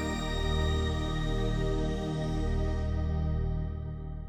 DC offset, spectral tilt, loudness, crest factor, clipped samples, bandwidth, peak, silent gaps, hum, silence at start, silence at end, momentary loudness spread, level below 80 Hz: under 0.1%; -6.5 dB/octave; -32 LUFS; 14 dB; under 0.1%; 16 kHz; -16 dBFS; none; none; 0 s; 0 s; 4 LU; -34 dBFS